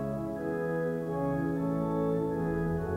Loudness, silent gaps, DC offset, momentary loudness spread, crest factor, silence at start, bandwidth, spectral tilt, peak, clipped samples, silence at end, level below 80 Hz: -32 LUFS; none; under 0.1%; 4 LU; 12 dB; 0 s; 15.5 kHz; -9.5 dB/octave; -20 dBFS; under 0.1%; 0 s; -50 dBFS